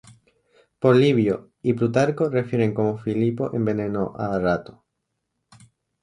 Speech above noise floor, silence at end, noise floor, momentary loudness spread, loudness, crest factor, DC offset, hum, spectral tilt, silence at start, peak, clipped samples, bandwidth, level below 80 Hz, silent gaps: 57 dB; 1.3 s; -78 dBFS; 9 LU; -22 LUFS; 18 dB; under 0.1%; none; -8 dB/octave; 0.8 s; -4 dBFS; under 0.1%; 10.5 kHz; -54 dBFS; none